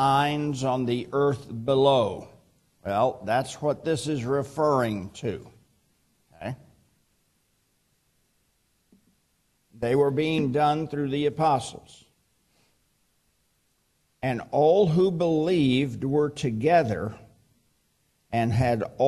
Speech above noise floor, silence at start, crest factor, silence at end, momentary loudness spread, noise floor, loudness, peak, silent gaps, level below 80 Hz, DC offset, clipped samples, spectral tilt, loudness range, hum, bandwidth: 46 dB; 0 s; 18 dB; 0 s; 12 LU; -70 dBFS; -25 LUFS; -8 dBFS; none; -58 dBFS; under 0.1%; under 0.1%; -6.5 dB/octave; 16 LU; none; 13 kHz